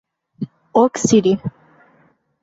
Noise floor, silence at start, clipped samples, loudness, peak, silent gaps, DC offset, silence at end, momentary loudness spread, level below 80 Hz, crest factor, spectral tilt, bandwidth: -57 dBFS; 0.4 s; under 0.1%; -16 LUFS; -2 dBFS; none; under 0.1%; 0.95 s; 17 LU; -56 dBFS; 18 dB; -5.5 dB/octave; 8 kHz